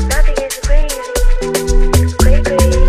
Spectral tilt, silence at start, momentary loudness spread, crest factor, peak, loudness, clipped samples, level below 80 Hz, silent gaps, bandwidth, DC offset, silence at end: -5 dB/octave; 0 s; 5 LU; 10 dB; 0 dBFS; -15 LUFS; under 0.1%; -12 dBFS; none; 15.5 kHz; under 0.1%; 0 s